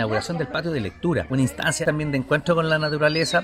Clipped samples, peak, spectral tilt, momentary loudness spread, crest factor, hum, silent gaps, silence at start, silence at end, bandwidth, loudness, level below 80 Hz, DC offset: under 0.1%; -6 dBFS; -5 dB/octave; 6 LU; 16 dB; none; none; 0 s; 0 s; 15.5 kHz; -23 LUFS; -48 dBFS; under 0.1%